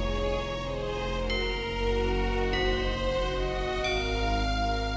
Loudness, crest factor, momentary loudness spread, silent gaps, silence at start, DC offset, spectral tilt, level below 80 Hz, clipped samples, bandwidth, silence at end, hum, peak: -29 LUFS; 12 dB; 4 LU; none; 0 s; under 0.1%; -5 dB/octave; -32 dBFS; under 0.1%; 8 kHz; 0 s; none; -16 dBFS